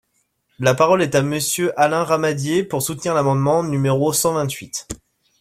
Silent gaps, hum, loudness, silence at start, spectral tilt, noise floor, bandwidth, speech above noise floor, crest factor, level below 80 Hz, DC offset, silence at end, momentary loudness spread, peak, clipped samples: none; none; -19 LUFS; 0.6 s; -4.5 dB/octave; -67 dBFS; 16 kHz; 49 dB; 18 dB; -52 dBFS; under 0.1%; 0.45 s; 10 LU; -2 dBFS; under 0.1%